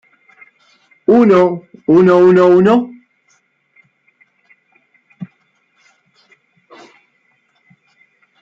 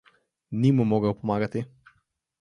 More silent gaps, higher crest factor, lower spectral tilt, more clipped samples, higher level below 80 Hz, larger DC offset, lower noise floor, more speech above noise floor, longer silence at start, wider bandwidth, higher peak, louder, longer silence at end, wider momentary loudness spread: neither; about the same, 14 dB vs 18 dB; about the same, -8.5 dB/octave vs -9 dB/octave; neither; about the same, -60 dBFS vs -58 dBFS; neither; second, -60 dBFS vs -70 dBFS; first, 51 dB vs 47 dB; first, 1.1 s vs 0.5 s; second, 7.2 kHz vs 10 kHz; first, -2 dBFS vs -10 dBFS; first, -11 LUFS vs -25 LUFS; first, 3.15 s vs 0.75 s; first, 26 LU vs 13 LU